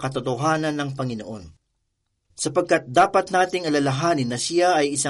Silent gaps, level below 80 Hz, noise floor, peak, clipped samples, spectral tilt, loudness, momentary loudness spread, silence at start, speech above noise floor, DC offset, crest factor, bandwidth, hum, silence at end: none; -58 dBFS; -74 dBFS; -6 dBFS; under 0.1%; -4.5 dB/octave; -22 LUFS; 11 LU; 0 s; 53 dB; under 0.1%; 18 dB; 11.5 kHz; none; 0 s